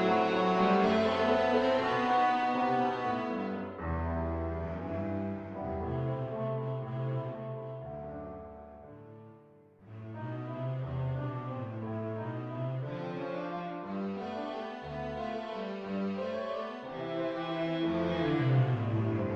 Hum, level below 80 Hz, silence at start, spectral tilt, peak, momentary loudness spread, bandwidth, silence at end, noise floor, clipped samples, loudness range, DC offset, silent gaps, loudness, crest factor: none; -50 dBFS; 0 s; -8 dB/octave; -16 dBFS; 14 LU; 8 kHz; 0 s; -58 dBFS; under 0.1%; 11 LU; under 0.1%; none; -33 LUFS; 16 dB